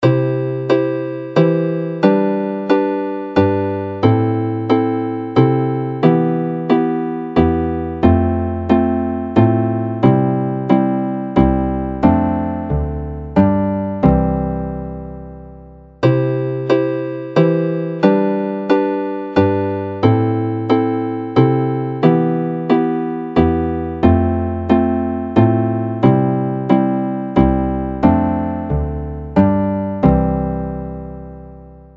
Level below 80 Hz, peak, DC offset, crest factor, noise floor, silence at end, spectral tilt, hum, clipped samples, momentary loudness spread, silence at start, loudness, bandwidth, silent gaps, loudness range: -32 dBFS; 0 dBFS; under 0.1%; 16 dB; -39 dBFS; 0.15 s; -10 dB/octave; none; under 0.1%; 7 LU; 0 s; -17 LUFS; 6.2 kHz; none; 3 LU